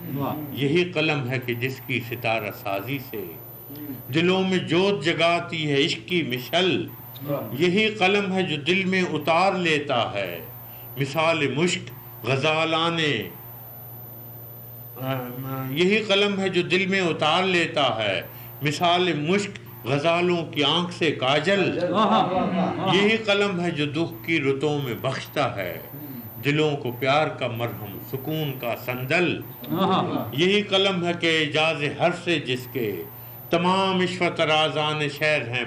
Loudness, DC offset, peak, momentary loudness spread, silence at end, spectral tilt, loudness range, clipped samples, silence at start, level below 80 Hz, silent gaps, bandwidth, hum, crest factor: -23 LUFS; under 0.1%; -10 dBFS; 15 LU; 0 s; -5 dB/octave; 4 LU; under 0.1%; 0 s; -62 dBFS; none; 15.5 kHz; none; 14 dB